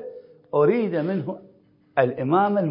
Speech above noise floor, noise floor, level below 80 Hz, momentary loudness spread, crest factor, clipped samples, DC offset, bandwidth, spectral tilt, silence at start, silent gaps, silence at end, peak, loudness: 20 dB; -41 dBFS; -72 dBFS; 14 LU; 18 dB; under 0.1%; under 0.1%; 5.4 kHz; -12 dB/octave; 0 s; none; 0 s; -4 dBFS; -23 LUFS